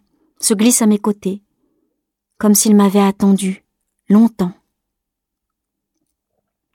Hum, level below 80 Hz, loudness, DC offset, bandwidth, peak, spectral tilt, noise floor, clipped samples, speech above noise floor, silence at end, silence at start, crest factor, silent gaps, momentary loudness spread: none; -58 dBFS; -14 LUFS; under 0.1%; 17 kHz; -2 dBFS; -5 dB/octave; -79 dBFS; under 0.1%; 66 dB; 2.2 s; 0.4 s; 16 dB; none; 12 LU